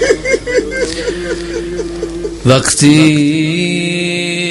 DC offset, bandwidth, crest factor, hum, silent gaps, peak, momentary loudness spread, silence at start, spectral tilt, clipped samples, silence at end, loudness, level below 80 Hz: under 0.1%; 12 kHz; 12 dB; none; none; 0 dBFS; 12 LU; 0 s; -4.5 dB/octave; 0.3%; 0 s; -13 LUFS; -34 dBFS